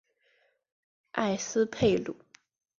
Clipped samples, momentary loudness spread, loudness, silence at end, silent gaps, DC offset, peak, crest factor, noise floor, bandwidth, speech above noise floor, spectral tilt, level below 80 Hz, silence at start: under 0.1%; 14 LU; -29 LUFS; 0.65 s; none; under 0.1%; -12 dBFS; 20 dB; -70 dBFS; 7.6 kHz; 42 dB; -4.5 dB/octave; -60 dBFS; 1.15 s